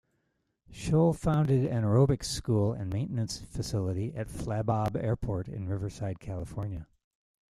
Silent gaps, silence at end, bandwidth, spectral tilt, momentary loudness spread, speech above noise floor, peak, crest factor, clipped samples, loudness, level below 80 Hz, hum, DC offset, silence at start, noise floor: none; 0.7 s; 13 kHz; -7 dB/octave; 12 LU; 48 dB; -12 dBFS; 18 dB; under 0.1%; -30 LUFS; -48 dBFS; none; under 0.1%; 0.7 s; -78 dBFS